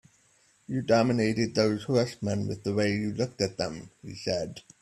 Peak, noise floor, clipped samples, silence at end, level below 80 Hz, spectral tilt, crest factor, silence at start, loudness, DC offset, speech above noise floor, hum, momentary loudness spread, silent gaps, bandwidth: -8 dBFS; -65 dBFS; under 0.1%; 0.2 s; -60 dBFS; -6 dB/octave; 20 dB; 0.7 s; -28 LUFS; under 0.1%; 37 dB; none; 11 LU; none; 12.5 kHz